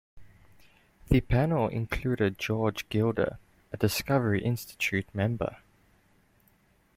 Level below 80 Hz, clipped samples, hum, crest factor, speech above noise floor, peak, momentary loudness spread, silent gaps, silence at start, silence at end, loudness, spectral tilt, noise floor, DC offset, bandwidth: -44 dBFS; under 0.1%; none; 22 dB; 37 dB; -8 dBFS; 6 LU; none; 0.15 s; 1.4 s; -29 LUFS; -6 dB/octave; -65 dBFS; under 0.1%; 16.5 kHz